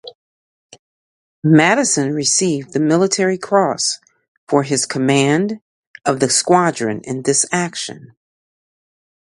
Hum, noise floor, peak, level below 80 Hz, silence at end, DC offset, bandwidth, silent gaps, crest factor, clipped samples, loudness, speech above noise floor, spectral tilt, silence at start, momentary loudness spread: none; under -90 dBFS; 0 dBFS; -62 dBFS; 1.3 s; under 0.1%; 11.5 kHz; 0.15-0.69 s, 0.79-1.42 s, 4.28-4.47 s, 5.62-5.94 s; 18 dB; under 0.1%; -16 LUFS; over 74 dB; -4 dB/octave; 0.05 s; 10 LU